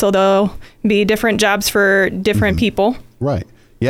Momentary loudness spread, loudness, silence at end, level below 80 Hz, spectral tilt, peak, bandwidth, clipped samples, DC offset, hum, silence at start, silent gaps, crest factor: 9 LU; -15 LUFS; 0 s; -36 dBFS; -5 dB/octave; -2 dBFS; 17 kHz; under 0.1%; under 0.1%; none; 0 s; none; 14 dB